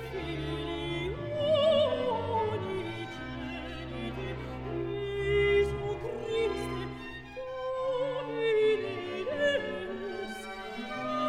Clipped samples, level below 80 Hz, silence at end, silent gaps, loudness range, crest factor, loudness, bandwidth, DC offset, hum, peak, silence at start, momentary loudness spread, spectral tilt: under 0.1%; -48 dBFS; 0 s; none; 2 LU; 16 dB; -32 LUFS; 12.5 kHz; under 0.1%; none; -16 dBFS; 0 s; 12 LU; -6 dB/octave